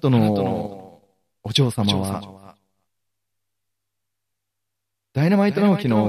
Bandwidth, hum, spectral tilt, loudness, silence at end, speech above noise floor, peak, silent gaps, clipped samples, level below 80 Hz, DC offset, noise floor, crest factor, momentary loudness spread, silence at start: 13.5 kHz; none; -6.5 dB/octave; -20 LUFS; 0 s; 63 dB; -6 dBFS; none; under 0.1%; -60 dBFS; under 0.1%; -82 dBFS; 16 dB; 17 LU; 0.05 s